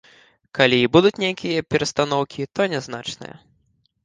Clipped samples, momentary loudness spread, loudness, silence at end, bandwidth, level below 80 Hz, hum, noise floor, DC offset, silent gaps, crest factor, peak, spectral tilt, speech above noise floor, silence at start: under 0.1%; 16 LU; -20 LUFS; 0.8 s; 9.8 kHz; -56 dBFS; none; -65 dBFS; under 0.1%; none; 22 dB; 0 dBFS; -5 dB/octave; 45 dB; 0.55 s